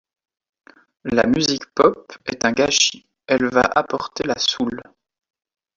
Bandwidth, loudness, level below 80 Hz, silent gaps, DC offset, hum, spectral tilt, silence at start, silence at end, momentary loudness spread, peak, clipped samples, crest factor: 7.6 kHz; -19 LUFS; -52 dBFS; none; under 0.1%; none; -3 dB/octave; 1.05 s; 0.95 s; 14 LU; 0 dBFS; under 0.1%; 20 dB